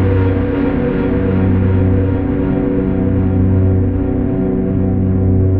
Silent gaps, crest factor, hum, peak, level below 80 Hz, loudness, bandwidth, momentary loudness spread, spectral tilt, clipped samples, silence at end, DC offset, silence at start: none; 10 dB; none; -2 dBFS; -26 dBFS; -15 LUFS; 3.6 kHz; 3 LU; -10 dB/octave; under 0.1%; 0 s; 0.8%; 0 s